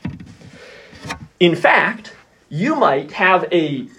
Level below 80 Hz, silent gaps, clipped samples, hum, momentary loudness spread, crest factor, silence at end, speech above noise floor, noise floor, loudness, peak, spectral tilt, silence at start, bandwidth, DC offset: -56 dBFS; none; under 0.1%; none; 18 LU; 18 dB; 0.1 s; 26 dB; -42 dBFS; -16 LUFS; 0 dBFS; -6 dB/octave; 0.05 s; 11.5 kHz; under 0.1%